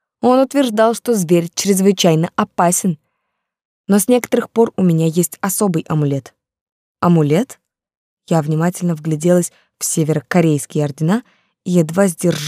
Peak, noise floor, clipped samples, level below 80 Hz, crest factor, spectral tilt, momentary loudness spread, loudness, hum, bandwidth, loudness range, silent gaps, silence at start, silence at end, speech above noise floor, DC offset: -2 dBFS; -74 dBFS; under 0.1%; -64 dBFS; 14 dB; -5.5 dB/octave; 7 LU; -16 LUFS; none; 16 kHz; 3 LU; 3.65-3.84 s, 6.61-6.95 s, 7.97-8.17 s; 0.25 s; 0 s; 59 dB; under 0.1%